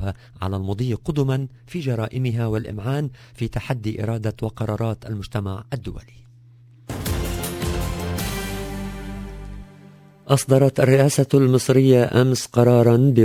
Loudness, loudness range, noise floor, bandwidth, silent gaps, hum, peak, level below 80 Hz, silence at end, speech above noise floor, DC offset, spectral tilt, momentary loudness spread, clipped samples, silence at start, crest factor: -21 LUFS; 11 LU; -48 dBFS; 16 kHz; none; none; -2 dBFS; -38 dBFS; 0 s; 29 dB; under 0.1%; -6.5 dB/octave; 16 LU; under 0.1%; 0 s; 20 dB